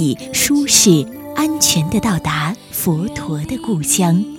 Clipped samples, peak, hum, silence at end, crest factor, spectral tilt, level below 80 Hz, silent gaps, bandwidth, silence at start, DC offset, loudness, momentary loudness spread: under 0.1%; 0 dBFS; none; 0 s; 16 dB; -3.5 dB/octave; -44 dBFS; none; 17.5 kHz; 0 s; under 0.1%; -15 LUFS; 12 LU